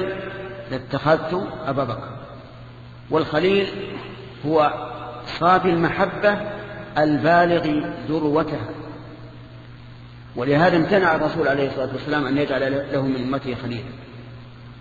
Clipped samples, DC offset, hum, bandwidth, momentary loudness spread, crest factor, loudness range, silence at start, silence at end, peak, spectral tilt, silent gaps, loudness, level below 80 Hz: under 0.1%; under 0.1%; none; 7.4 kHz; 23 LU; 20 dB; 5 LU; 0 s; 0 s; -2 dBFS; -7.5 dB/octave; none; -21 LUFS; -48 dBFS